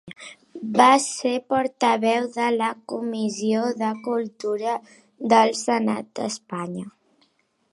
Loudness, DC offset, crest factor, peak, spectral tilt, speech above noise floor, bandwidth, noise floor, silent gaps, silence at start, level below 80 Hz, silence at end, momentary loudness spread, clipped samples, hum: -23 LUFS; under 0.1%; 22 dB; -2 dBFS; -4 dB/octave; 44 dB; 11.5 kHz; -66 dBFS; none; 0.05 s; -72 dBFS; 0.85 s; 15 LU; under 0.1%; none